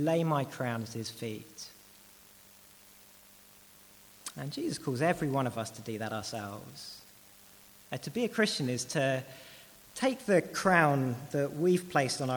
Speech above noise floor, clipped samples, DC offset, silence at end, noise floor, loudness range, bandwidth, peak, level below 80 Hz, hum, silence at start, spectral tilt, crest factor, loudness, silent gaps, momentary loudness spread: 26 dB; under 0.1%; under 0.1%; 0 s; -57 dBFS; 15 LU; over 20 kHz; -10 dBFS; -68 dBFS; 50 Hz at -70 dBFS; 0 s; -5 dB/octave; 24 dB; -31 LUFS; none; 18 LU